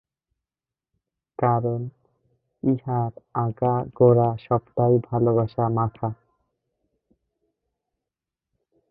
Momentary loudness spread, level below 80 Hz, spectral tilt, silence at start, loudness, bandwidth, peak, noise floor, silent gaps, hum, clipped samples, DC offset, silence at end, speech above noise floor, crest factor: 13 LU; -56 dBFS; -13.5 dB/octave; 1.4 s; -23 LUFS; 4.8 kHz; -4 dBFS; under -90 dBFS; none; none; under 0.1%; under 0.1%; 2.75 s; over 68 dB; 22 dB